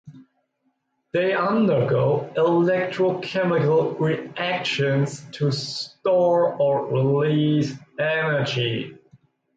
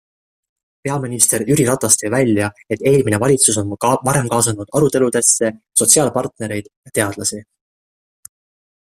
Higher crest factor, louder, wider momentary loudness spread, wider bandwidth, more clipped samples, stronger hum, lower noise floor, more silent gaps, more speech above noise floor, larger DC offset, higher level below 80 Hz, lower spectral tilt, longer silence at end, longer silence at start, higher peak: second, 12 dB vs 18 dB; second, -22 LUFS vs -15 LUFS; second, 7 LU vs 11 LU; second, 9 kHz vs 16 kHz; neither; neither; second, -71 dBFS vs under -90 dBFS; second, none vs 6.76-6.83 s; second, 50 dB vs over 74 dB; neither; second, -64 dBFS vs -52 dBFS; first, -6.5 dB/octave vs -4 dB/octave; second, 0.65 s vs 1.4 s; second, 0.05 s vs 0.85 s; second, -10 dBFS vs 0 dBFS